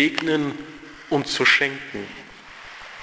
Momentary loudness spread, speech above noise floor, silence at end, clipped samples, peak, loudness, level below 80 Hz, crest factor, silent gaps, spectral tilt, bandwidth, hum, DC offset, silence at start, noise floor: 24 LU; 20 dB; 0 s; under 0.1%; -4 dBFS; -21 LUFS; -60 dBFS; 20 dB; none; -3.5 dB/octave; 8 kHz; none; under 0.1%; 0 s; -42 dBFS